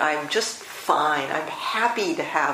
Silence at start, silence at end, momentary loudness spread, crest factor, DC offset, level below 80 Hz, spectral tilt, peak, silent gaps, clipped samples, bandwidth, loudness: 0 s; 0 s; 6 LU; 20 dB; under 0.1%; -74 dBFS; -2 dB/octave; -4 dBFS; none; under 0.1%; 15.5 kHz; -24 LUFS